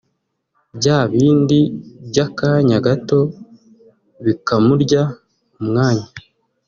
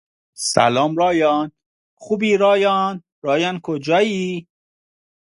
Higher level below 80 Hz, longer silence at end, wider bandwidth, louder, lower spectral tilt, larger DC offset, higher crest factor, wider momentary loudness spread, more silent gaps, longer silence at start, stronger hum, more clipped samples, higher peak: first, -52 dBFS vs -62 dBFS; second, 0.5 s vs 0.95 s; second, 7.2 kHz vs 11.5 kHz; about the same, -16 LUFS vs -18 LUFS; first, -6.5 dB/octave vs -4.5 dB/octave; neither; about the same, 16 dB vs 20 dB; about the same, 9 LU vs 11 LU; second, none vs 1.66-1.97 s, 3.12-3.22 s; first, 0.75 s vs 0.4 s; neither; neither; about the same, 0 dBFS vs 0 dBFS